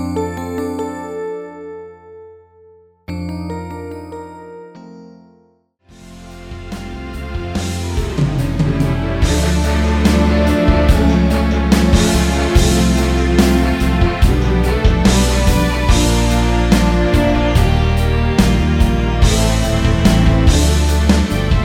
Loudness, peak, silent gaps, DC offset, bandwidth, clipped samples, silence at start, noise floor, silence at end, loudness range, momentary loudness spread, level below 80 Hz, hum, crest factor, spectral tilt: -15 LUFS; 0 dBFS; none; under 0.1%; 16 kHz; under 0.1%; 0 s; -55 dBFS; 0 s; 16 LU; 16 LU; -18 dBFS; none; 14 dB; -5.5 dB/octave